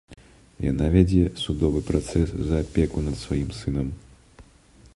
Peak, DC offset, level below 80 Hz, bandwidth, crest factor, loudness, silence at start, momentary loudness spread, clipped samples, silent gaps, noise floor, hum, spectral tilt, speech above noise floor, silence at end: -4 dBFS; under 0.1%; -32 dBFS; 11.5 kHz; 20 dB; -24 LUFS; 0.1 s; 10 LU; under 0.1%; none; -53 dBFS; none; -7.5 dB/octave; 30 dB; 0.55 s